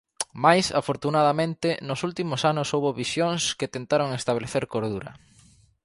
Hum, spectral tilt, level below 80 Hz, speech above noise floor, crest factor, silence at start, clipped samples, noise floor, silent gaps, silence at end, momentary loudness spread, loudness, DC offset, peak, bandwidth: none; -4.5 dB/octave; -60 dBFS; 32 dB; 22 dB; 0.2 s; under 0.1%; -57 dBFS; none; 0.65 s; 9 LU; -25 LUFS; under 0.1%; -2 dBFS; 11.5 kHz